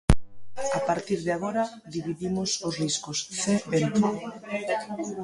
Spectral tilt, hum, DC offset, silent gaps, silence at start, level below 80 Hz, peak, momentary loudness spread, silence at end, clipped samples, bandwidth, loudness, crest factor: -4.5 dB/octave; none; under 0.1%; none; 0.1 s; -38 dBFS; -2 dBFS; 9 LU; 0 s; under 0.1%; 11.5 kHz; -28 LUFS; 24 dB